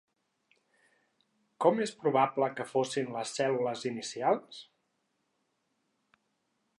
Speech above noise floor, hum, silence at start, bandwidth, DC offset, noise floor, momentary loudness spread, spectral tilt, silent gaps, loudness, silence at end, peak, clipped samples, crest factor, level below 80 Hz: 48 dB; none; 1.6 s; 11.5 kHz; under 0.1%; -79 dBFS; 8 LU; -4.5 dB/octave; none; -31 LUFS; 2.15 s; -10 dBFS; under 0.1%; 24 dB; -88 dBFS